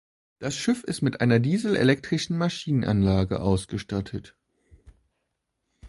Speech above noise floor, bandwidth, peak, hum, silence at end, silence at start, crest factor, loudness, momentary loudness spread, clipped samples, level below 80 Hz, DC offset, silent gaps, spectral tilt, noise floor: 55 dB; 11.5 kHz; -6 dBFS; none; 0 s; 0.4 s; 20 dB; -25 LUFS; 9 LU; under 0.1%; -46 dBFS; under 0.1%; none; -6 dB/octave; -79 dBFS